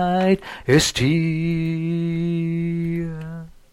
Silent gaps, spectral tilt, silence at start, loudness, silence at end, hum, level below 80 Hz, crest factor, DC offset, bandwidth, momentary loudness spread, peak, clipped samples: none; -5.5 dB/octave; 0 s; -21 LUFS; 0.25 s; none; -44 dBFS; 16 dB; 0.1%; 13 kHz; 12 LU; -4 dBFS; under 0.1%